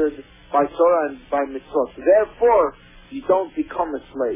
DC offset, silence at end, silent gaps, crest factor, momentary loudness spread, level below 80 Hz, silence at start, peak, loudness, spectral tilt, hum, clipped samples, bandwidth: under 0.1%; 0 s; none; 16 dB; 9 LU; -50 dBFS; 0 s; -4 dBFS; -20 LUFS; -9.5 dB/octave; none; under 0.1%; 3.8 kHz